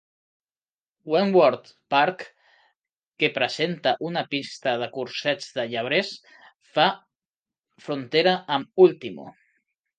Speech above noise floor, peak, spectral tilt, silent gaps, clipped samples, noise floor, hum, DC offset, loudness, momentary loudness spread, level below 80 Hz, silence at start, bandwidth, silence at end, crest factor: over 67 dB; -4 dBFS; -5 dB/octave; 3.07-3.12 s, 7.25-7.31 s; under 0.1%; under -90 dBFS; none; under 0.1%; -23 LUFS; 17 LU; -76 dBFS; 1.05 s; 9.2 kHz; 0.7 s; 22 dB